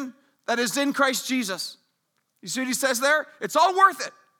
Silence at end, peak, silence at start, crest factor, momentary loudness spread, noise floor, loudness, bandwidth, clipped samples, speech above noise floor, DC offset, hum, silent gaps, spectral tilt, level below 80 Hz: 0.3 s; -4 dBFS; 0 s; 20 dB; 15 LU; -74 dBFS; -23 LUFS; over 20 kHz; under 0.1%; 51 dB; under 0.1%; none; none; -1.5 dB/octave; -84 dBFS